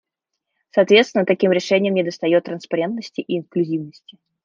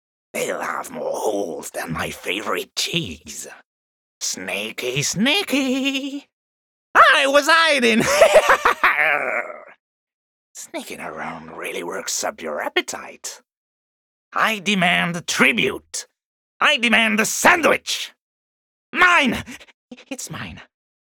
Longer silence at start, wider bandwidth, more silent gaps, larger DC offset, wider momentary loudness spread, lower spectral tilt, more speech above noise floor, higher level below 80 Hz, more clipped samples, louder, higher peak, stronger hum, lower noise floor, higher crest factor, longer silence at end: first, 0.75 s vs 0.35 s; second, 7.6 kHz vs over 20 kHz; second, none vs 3.65-4.21 s, 6.33-6.94 s, 9.80-10.07 s, 10.14-10.55 s, 13.57-14.31 s, 16.25-16.60 s, 18.20-18.93 s, 19.74-19.89 s; neither; second, 11 LU vs 18 LU; first, -5.5 dB/octave vs -2.5 dB/octave; second, 61 dB vs over 70 dB; second, -70 dBFS vs -56 dBFS; neither; about the same, -19 LUFS vs -18 LUFS; about the same, -2 dBFS vs -2 dBFS; neither; second, -80 dBFS vs under -90 dBFS; about the same, 18 dB vs 18 dB; about the same, 0.55 s vs 0.45 s